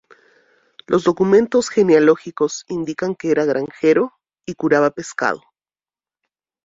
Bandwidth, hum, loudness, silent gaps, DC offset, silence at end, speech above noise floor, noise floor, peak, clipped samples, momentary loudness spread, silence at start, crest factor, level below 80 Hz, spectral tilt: 7.8 kHz; none; -18 LUFS; none; under 0.1%; 1.3 s; over 73 dB; under -90 dBFS; -2 dBFS; under 0.1%; 11 LU; 0.9 s; 16 dB; -60 dBFS; -5.5 dB/octave